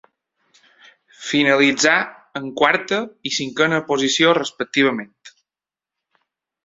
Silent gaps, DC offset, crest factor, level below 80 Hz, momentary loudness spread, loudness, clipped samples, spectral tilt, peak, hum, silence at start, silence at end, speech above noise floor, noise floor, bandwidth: none; under 0.1%; 20 dB; -64 dBFS; 15 LU; -18 LUFS; under 0.1%; -3 dB/octave; 0 dBFS; none; 1.2 s; 1.35 s; 71 dB; -90 dBFS; 8 kHz